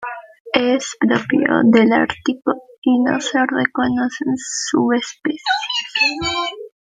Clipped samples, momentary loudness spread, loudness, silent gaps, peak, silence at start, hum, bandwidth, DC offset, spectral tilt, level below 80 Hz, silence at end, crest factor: under 0.1%; 9 LU; -18 LUFS; 0.40-0.45 s, 2.78-2.82 s; -2 dBFS; 0 s; none; 9.4 kHz; under 0.1%; -3.5 dB/octave; -54 dBFS; 0.15 s; 16 dB